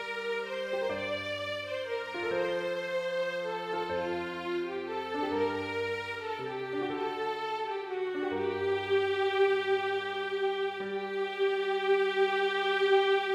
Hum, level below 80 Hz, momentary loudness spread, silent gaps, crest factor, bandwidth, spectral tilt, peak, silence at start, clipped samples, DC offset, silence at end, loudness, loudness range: none; -74 dBFS; 8 LU; none; 16 dB; 9.8 kHz; -4.5 dB/octave; -16 dBFS; 0 s; under 0.1%; under 0.1%; 0 s; -31 LUFS; 4 LU